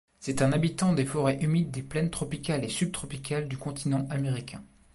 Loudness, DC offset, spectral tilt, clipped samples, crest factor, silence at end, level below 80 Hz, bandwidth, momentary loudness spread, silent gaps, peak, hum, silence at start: -29 LUFS; under 0.1%; -6 dB/octave; under 0.1%; 16 dB; 0.3 s; -54 dBFS; 11.5 kHz; 9 LU; none; -14 dBFS; none; 0.2 s